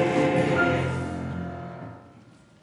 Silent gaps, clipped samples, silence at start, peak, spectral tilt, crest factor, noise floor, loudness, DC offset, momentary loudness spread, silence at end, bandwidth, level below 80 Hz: none; under 0.1%; 0 s; -10 dBFS; -7 dB/octave; 16 dB; -52 dBFS; -25 LUFS; under 0.1%; 17 LU; 0.4 s; 11.5 kHz; -56 dBFS